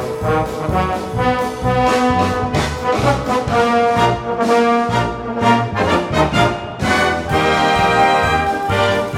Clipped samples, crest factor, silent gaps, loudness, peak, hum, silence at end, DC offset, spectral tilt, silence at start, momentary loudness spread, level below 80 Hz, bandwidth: under 0.1%; 16 dB; none; -16 LUFS; 0 dBFS; none; 0 s; under 0.1%; -5.5 dB/octave; 0 s; 5 LU; -34 dBFS; 16.5 kHz